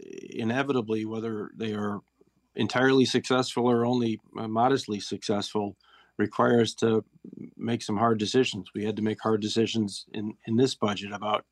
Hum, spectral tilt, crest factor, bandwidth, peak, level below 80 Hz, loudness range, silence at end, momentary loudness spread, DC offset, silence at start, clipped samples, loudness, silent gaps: none; -5.5 dB/octave; 18 dB; 12 kHz; -10 dBFS; -72 dBFS; 2 LU; 0.1 s; 12 LU; under 0.1%; 0.05 s; under 0.1%; -27 LUFS; none